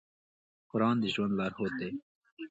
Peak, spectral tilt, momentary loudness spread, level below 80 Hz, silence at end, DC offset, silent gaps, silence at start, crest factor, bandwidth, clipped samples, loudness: -16 dBFS; -7 dB/octave; 13 LU; -68 dBFS; 0.05 s; under 0.1%; 2.02-2.21 s, 2.32-2.37 s; 0.75 s; 18 dB; 8 kHz; under 0.1%; -32 LUFS